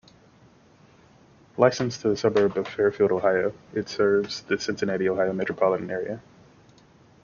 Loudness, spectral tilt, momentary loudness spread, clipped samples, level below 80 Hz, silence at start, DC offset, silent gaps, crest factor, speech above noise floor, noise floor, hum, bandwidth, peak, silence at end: -24 LUFS; -5.5 dB/octave; 9 LU; under 0.1%; -62 dBFS; 1.55 s; under 0.1%; none; 22 dB; 32 dB; -55 dBFS; none; 7.2 kHz; -4 dBFS; 1.05 s